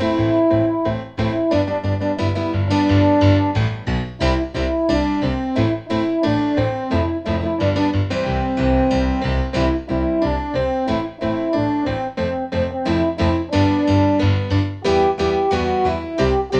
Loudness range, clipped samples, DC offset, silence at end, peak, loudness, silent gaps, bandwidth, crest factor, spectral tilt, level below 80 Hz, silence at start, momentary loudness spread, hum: 3 LU; under 0.1%; under 0.1%; 0 s; -4 dBFS; -19 LUFS; none; 8.2 kHz; 14 dB; -7.5 dB/octave; -30 dBFS; 0 s; 6 LU; none